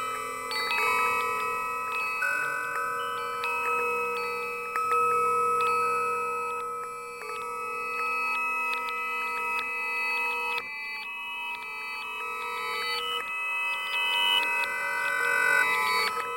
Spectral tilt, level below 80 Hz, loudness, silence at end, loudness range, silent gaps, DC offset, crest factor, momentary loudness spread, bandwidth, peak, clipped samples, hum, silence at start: -0.5 dB/octave; -68 dBFS; -27 LUFS; 0 s; 5 LU; none; under 0.1%; 16 dB; 10 LU; 16.5 kHz; -12 dBFS; under 0.1%; none; 0 s